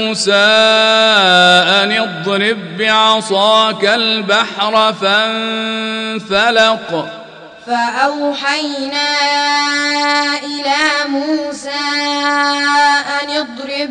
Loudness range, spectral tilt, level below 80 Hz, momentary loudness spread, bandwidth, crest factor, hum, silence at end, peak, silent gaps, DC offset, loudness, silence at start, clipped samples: 5 LU; -2.5 dB/octave; -58 dBFS; 10 LU; 10.5 kHz; 12 dB; none; 0 s; 0 dBFS; none; under 0.1%; -12 LUFS; 0 s; under 0.1%